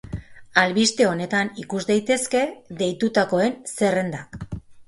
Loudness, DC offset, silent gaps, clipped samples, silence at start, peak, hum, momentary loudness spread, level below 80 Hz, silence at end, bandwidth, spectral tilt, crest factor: -22 LUFS; under 0.1%; none; under 0.1%; 0.05 s; -2 dBFS; none; 16 LU; -50 dBFS; 0.05 s; 11.5 kHz; -4 dB/octave; 22 dB